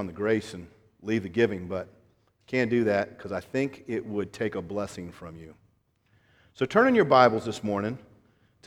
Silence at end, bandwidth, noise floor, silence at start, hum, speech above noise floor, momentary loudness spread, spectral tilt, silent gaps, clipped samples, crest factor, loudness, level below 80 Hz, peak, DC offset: 0.7 s; 13.5 kHz; -67 dBFS; 0 s; none; 41 dB; 22 LU; -6.5 dB/octave; none; under 0.1%; 24 dB; -27 LUFS; -62 dBFS; -4 dBFS; under 0.1%